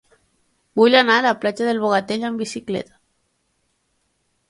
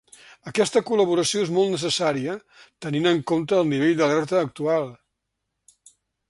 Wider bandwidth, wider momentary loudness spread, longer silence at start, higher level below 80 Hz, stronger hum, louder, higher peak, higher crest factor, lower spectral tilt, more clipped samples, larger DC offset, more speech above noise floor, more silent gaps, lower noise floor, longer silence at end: about the same, 11.5 kHz vs 11.5 kHz; first, 14 LU vs 10 LU; first, 0.75 s vs 0.45 s; about the same, -66 dBFS vs -64 dBFS; neither; first, -18 LUFS vs -22 LUFS; first, 0 dBFS vs -6 dBFS; about the same, 20 dB vs 18 dB; about the same, -4 dB/octave vs -4.5 dB/octave; neither; neither; second, 51 dB vs 57 dB; neither; second, -69 dBFS vs -80 dBFS; first, 1.65 s vs 1.35 s